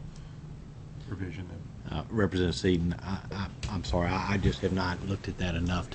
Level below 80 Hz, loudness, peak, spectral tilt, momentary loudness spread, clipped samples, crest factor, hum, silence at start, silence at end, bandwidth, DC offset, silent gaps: -42 dBFS; -31 LUFS; -12 dBFS; -6.5 dB/octave; 17 LU; under 0.1%; 18 dB; none; 0 s; 0 s; 8.6 kHz; under 0.1%; none